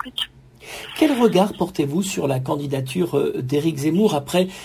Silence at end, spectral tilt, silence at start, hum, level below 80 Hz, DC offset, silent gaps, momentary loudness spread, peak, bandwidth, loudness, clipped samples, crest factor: 0 s; -5.5 dB/octave; 0 s; none; -54 dBFS; under 0.1%; none; 10 LU; -2 dBFS; 16 kHz; -21 LUFS; under 0.1%; 18 dB